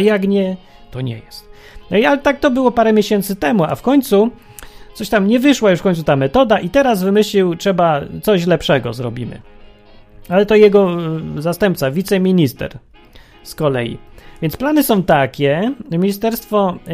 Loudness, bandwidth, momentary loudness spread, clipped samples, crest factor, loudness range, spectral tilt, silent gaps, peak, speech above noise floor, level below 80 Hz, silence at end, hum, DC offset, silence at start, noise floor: -15 LUFS; 15.5 kHz; 12 LU; under 0.1%; 16 dB; 4 LU; -6 dB/octave; none; 0 dBFS; 28 dB; -42 dBFS; 0 s; none; under 0.1%; 0 s; -42 dBFS